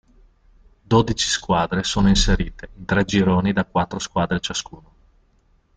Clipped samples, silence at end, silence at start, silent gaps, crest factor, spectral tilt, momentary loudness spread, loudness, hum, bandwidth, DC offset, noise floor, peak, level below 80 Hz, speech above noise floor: under 0.1%; 1.15 s; 0.9 s; none; 18 dB; -4.5 dB/octave; 9 LU; -20 LUFS; none; 9.4 kHz; under 0.1%; -60 dBFS; -4 dBFS; -32 dBFS; 40 dB